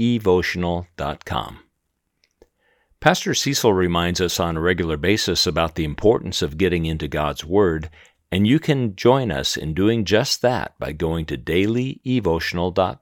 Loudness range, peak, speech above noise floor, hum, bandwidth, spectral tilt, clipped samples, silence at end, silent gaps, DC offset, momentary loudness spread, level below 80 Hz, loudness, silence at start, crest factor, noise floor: 3 LU; 0 dBFS; 54 dB; none; 19.5 kHz; -5 dB/octave; under 0.1%; 0.05 s; none; under 0.1%; 8 LU; -42 dBFS; -20 LUFS; 0 s; 20 dB; -74 dBFS